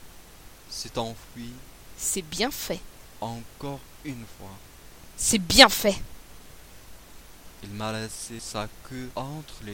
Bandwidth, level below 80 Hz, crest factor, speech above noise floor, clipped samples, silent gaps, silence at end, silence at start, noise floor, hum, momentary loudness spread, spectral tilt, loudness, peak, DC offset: 17 kHz; -46 dBFS; 28 dB; 21 dB; under 0.1%; none; 0 s; 0 s; -48 dBFS; none; 25 LU; -2 dB/octave; -24 LUFS; 0 dBFS; under 0.1%